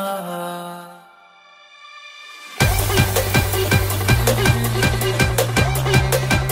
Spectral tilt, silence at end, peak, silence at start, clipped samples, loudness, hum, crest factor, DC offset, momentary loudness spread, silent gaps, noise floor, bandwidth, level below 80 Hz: -4.5 dB/octave; 0 s; -2 dBFS; 0 s; under 0.1%; -18 LUFS; none; 18 dB; under 0.1%; 19 LU; none; -48 dBFS; 16.5 kHz; -30 dBFS